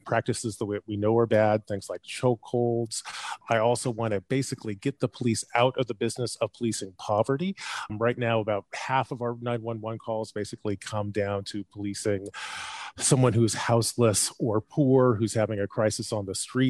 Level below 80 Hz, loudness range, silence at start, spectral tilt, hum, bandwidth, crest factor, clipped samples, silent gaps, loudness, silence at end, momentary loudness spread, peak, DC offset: -64 dBFS; 7 LU; 0.05 s; -5 dB/octave; none; 13 kHz; 20 dB; under 0.1%; none; -27 LUFS; 0 s; 11 LU; -8 dBFS; under 0.1%